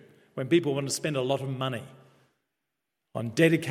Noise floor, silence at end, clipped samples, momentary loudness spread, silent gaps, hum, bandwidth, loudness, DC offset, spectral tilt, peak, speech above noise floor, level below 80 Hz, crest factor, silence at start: -84 dBFS; 0 s; under 0.1%; 15 LU; none; none; 15.5 kHz; -28 LUFS; under 0.1%; -5.5 dB/octave; -8 dBFS; 57 dB; -72 dBFS; 22 dB; 0.35 s